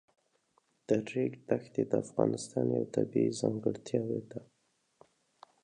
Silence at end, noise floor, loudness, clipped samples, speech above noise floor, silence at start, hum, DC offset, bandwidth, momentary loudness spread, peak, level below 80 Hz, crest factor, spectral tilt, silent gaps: 1.2 s; -74 dBFS; -33 LUFS; under 0.1%; 42 dB; 0.9 s; none; under 0.1%; 10.5 kHz; 6 LU; -12 dBFS; -74 dBFS; 22 dB; -6.5 dB/octave; none